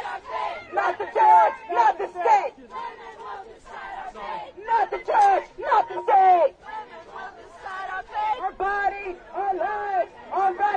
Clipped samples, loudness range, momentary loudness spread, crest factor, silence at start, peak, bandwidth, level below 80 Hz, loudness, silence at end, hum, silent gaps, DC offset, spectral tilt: under 0.1%; 6 LU; 20 LU; 18 dB; 0 s; -6 dBFS; 9.2 kHz; -58 dBFS; -22 LUFS; 0 s; none; none; under 0.1%; -3.5 dB/octave